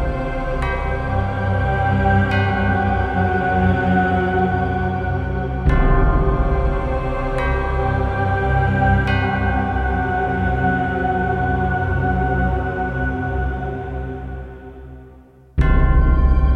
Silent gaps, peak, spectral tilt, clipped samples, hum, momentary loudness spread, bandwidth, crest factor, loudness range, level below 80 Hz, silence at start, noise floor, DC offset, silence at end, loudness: none; -4 dBFS; -9 dB/octave; under 0.1%; none; 7 LU; 5 kHz; 14 dB; 5 LU; -22 dBFS; 0 s; -44 dBFS; under 0.1%; 0 s; -19 LUFS